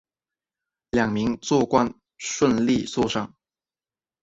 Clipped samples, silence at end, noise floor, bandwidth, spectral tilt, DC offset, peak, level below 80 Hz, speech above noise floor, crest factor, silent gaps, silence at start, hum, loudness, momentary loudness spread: under 0.1%; 0.95 s; under -90 dBFS; 8 kHz; -5 dB/octave; under 0.1%; -6 dBFS; -54 dBFS; over 68 dB; 20 dB; none; 0.95 s; none; -23 LUFS; 10 LU